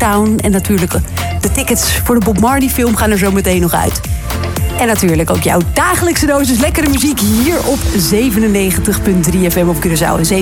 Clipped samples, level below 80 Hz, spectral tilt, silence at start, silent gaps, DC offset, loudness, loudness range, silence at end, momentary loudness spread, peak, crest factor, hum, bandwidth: under 0.1%; -22 dBFS; -4.5 dB/octave; 0 s; none; 0.2%; -12 LUFS; 1 LU; 0 s; 4 LU; 0 dBFS; 12 dB; none; 17.5 kHz